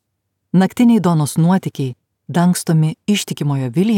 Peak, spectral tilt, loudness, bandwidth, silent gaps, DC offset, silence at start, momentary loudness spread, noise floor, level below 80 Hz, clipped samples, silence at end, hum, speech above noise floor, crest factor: -4 dBFS; -6.5 dB/octave; -16 LUFS; 17 kHz; none; under 0.1%; 0.55 s; 9 LU; -73 dBFS; -62 dBFS; under 0.1%; 0 s; none; 58 dB; 12 dB